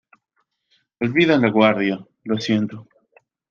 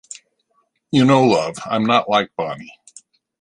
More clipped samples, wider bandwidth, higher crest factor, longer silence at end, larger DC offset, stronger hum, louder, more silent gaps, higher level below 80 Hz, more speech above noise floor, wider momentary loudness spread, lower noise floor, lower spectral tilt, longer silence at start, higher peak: neither; second, 7 kHz vs 11 kHz; about the same, 18 dB vs 18 dB; about the same, 0.7 s vs 0.75 s; neither; neither; about the same, -19 LUFS vs -17 LUFS; neither; second, -64 dBFS vs -58 dBFS; first, 53 dB vs 49 dB; second, 13 LU vs 23 LU; first, -71 dBFS vs -66 dBFS; about the same, -6.5 dB/octave vs -5.5 dB/octave; about the same, 1 s vs 0.9 s; about the same, -2 dBFS vs -2 dBFS